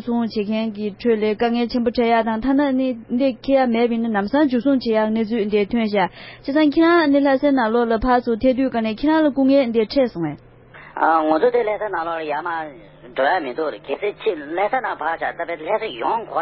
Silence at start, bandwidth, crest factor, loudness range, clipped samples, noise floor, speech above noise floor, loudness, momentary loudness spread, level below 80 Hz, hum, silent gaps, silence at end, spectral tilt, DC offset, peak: 0 s; 5.8 kHz; 16 dB; 6 LU; under 0.1%; -39 dBFS; 21 dB; -19 LUFS; 9 LU; -46 dBFS; none; none; 0 s; -10.5 dB/octave; under 0.1%; -2 dBFS